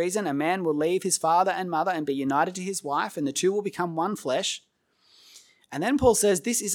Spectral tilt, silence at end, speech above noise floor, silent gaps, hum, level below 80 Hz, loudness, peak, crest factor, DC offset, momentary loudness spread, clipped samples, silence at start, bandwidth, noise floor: -3.5 dB/octave; 0 s; 38 dB; none; none; -56 dBFS; -25 LUFS; -6 dBFS; 20 dB; under 0.1%; 8 LU; under 0.1%; 0 s; 19 kHz; -63 dBFS